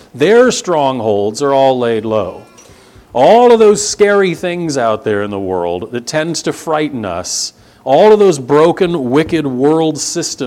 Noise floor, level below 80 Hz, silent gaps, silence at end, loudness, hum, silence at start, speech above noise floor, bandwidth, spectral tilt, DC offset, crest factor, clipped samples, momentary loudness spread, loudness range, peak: -41 dBFS; -50 dBFS; none; 0 s; -12 LUFS; none; 0.15 s; 29 dB; 14 kHz; -4.5 dB/octave; under 0.1%; 12 dB; 0.2%; 11 LU; 5 LU; 0 dBFS